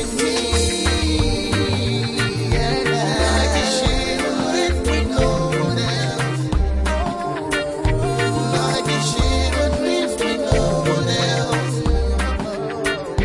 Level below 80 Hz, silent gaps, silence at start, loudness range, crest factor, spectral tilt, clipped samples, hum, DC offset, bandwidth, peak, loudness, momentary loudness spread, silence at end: -26 dBFS; none; 0 s; 2 LU; 16 dB; -4.5 dB/octave; under 0.1%; none; under 0.1%; 11.5 kHz; -4 dBFS; -20 LUFS; 4 LU; 0 s